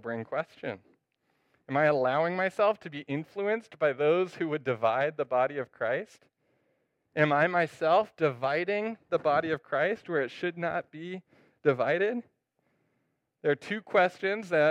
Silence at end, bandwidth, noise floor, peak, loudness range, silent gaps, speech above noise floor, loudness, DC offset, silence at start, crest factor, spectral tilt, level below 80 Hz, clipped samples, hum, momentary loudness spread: 0 s; 10.5 kHz; -78 dBFS; -10 dBFS; 3 LU; none; 49 dB; -29 LUFS; under 0.1%; 0.05 s; 20 dB; -6.5 dB/octave; -78 dBFS; under 0.1%; none; 10 LU